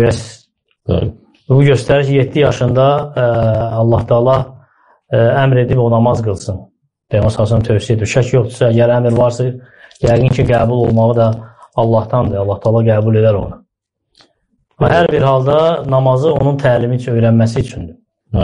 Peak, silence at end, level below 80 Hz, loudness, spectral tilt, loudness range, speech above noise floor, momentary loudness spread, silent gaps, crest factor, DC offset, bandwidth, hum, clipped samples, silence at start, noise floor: -2 dBFS; 0 s; -36 dBFS; -13 LUFS; -7.5 dB/octave; 2 LU; 60 dB; 9 LU; none; 12 dB; under 0.1%; 10.5 kHz; none; under 0.1%; 0 s; -72 dBFS